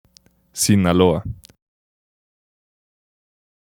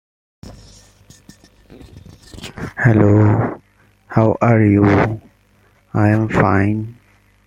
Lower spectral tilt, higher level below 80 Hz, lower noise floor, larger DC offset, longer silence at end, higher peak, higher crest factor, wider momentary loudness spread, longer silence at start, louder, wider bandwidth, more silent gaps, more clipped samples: second, -5 dB/octave vs -9 dB/octave; about the same, -46 dBFS vs -44 dBFS; about the same, -55 dBFS vs -54 dBFS; neither; first, 2.3 s vs 0.55 s; about the same, 0 dBFS vs -2 dBFS; first, 22 dB vs 16 dB; about the same, 20 LU vs 19 LU; about the same, 0.55 s vs 0.45 s; about the same, -17 LUFS vs -15 LUFS; first, 17.5 kHz vs 8 kHz; neither; neither